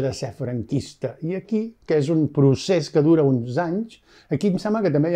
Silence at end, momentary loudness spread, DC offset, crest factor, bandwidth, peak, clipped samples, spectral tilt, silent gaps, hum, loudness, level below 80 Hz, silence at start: 0 s; 11 LU; under 0.1%; 16 dB; 10 kHz; -6 dBFS; under 0.1%; -7.5 dB/octave; none; none; -22 LUFS; -56 dBFS; 0 s